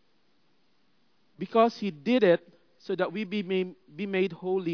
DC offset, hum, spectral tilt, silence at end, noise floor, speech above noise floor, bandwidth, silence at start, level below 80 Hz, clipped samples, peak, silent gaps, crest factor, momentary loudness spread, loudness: under 0.1%; none; -7 dB/octave; 0 s; -71 dBFS; 44 dB; 5.4 kHz; 1.4 s; under -90 dBFS; under 0.1%; -10 dBFS; none; 20 dB; 12 LU; -28 LUFS